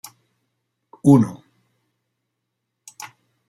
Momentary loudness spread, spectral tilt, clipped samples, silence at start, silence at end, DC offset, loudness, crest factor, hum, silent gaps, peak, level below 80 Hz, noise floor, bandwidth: 24 LU; -8 dB/octave; under 0.1%; 1.05 s; 0.45 s; under 0.1%; -17 LUFS; 22 dB; none; none; -2 dBFS; -66 dBFS; -78 dBFS; 13 kHz